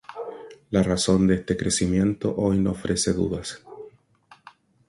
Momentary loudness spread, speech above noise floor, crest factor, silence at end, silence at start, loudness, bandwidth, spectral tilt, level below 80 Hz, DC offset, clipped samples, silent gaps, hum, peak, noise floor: 18 LU; 33 dB; 18 dB; 1 s; 0.1 s; -23 LUFS; 11.5 kHz; -5 dB/octave; -44 dBFS; under 0.1%; under 0.1%; none; none; -6 dBFS; -56 dBFS